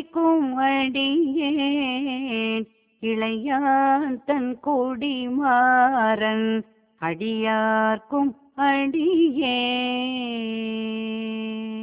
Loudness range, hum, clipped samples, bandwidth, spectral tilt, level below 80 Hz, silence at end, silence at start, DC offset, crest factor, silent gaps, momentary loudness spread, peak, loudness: 3 LU; none; under 0.1%; 4 kHz; -8.5 dB/octave; -66 dBFS; 0 s; 0 s; under 0.1%; 14 dB; none; 9 LU; -8 dBFS; -23 LUFS